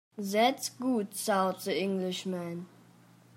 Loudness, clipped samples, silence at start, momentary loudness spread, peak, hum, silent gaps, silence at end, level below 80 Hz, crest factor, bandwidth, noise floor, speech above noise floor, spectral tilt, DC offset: -31 LUFS; under 0.1%; 0.15 s; 11 LU; -14 dBFS; none; none; 0.7 s; -84 dBFS; 18 dB; 16 kHz; -59 dBFS; 28 dB; -4.5 dB/octave; under 0.1%